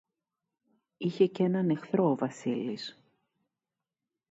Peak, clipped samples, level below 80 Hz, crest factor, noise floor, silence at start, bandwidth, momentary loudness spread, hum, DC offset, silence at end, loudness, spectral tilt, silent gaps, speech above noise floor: -12 dBFS; under 0.1%; -80 dBFS; 20 dB; -90 dBFS; 1 s; 8 kHz; 10 LU; none; under 0.1%; 1.4 s; -30 LUFS; -7.5 dB/octave; none; 61 dB